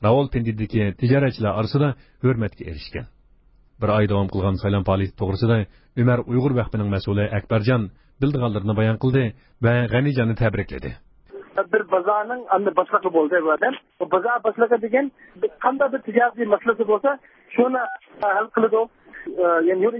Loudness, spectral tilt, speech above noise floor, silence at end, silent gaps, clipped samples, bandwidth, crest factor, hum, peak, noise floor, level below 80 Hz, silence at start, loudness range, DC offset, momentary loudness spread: -21 LUFS; -12.5 dB/octave; 34 dB; 0 s; none; under 0.1%; 5.8 kHz; 18 dB; none; -2 dBFS; -54 dBFS; -42 dBFS; 0 s; 2 LU; under 0.1%; 9 LU